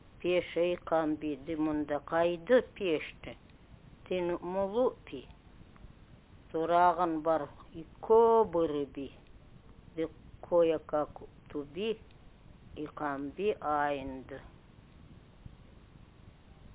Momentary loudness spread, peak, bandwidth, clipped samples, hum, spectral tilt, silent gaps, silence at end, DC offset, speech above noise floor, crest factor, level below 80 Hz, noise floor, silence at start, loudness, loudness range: 20 LU; -14 dBFS; 4 kHz; under 0.1%; none; -4.5 dB/octave; none; 0 s; under 0.1%; 25 dB; 20 dB; -58 dBFS; -56 dBFS; 0.2 s; -31 LUFS; 8 LU